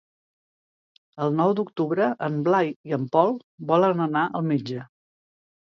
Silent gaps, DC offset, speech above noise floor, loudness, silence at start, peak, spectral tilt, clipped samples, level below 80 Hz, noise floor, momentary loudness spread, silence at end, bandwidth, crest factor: 2.76-2.84 s, 3.44-3.58 s; under 0.1%; over 67 dB; -24 LUFS; 1.15 s; -4 dBFS; -8.5 dB/octave; under 0.1%; -74 dBFS; under -90 dBFS; 8 LU; 0.9 s; 7 kHz; 20 dB